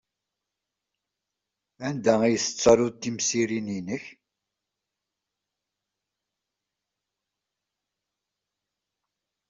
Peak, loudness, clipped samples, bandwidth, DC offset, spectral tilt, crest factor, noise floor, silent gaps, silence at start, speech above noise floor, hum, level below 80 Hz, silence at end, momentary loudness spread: -6 dBFS; -24 LUFS; under 0.1%; 8 kHz; under 0.1%; -4 dB/octave; 24 dB; -86 dBFS; none; 1.8 s; 62 dB; 50 Hz at -60 dBFS; -62 dBFS; 5.4 s; 14 LU